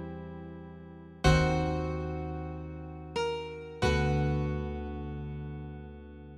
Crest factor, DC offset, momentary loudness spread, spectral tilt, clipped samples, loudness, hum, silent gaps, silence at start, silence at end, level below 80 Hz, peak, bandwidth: 22 dB; under 0.1%; 19 LU; -6.5 dB/octave; under 0.1%; -32 LUFS; none; none; 0 s; 0 s; -40 dBFS; -10 dBFS; 11 kHz